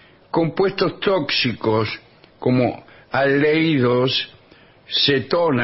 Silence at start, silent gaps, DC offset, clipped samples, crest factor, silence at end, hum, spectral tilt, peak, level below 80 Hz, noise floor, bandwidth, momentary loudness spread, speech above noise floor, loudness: 0.35 s; none; under 0.1%; under 0.1%; 16 dB; 0 s; none; -8.5 dB/octave; -4 dBFS; -54 dBFS; -50 dBFS; 6 kHz; 9 LU; 31 dB; -19 LUFS